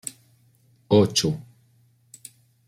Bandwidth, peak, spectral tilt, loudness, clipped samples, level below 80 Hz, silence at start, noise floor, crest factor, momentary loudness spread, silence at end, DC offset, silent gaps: 16 kHz; -4 dBFS; -5 dB/octave; -22 LUFS; under 0.1%; -60 dBFS; 0.05 s; -61 dBFS; 22 dB; 26 LU; 1.25 s; under 0.1%; none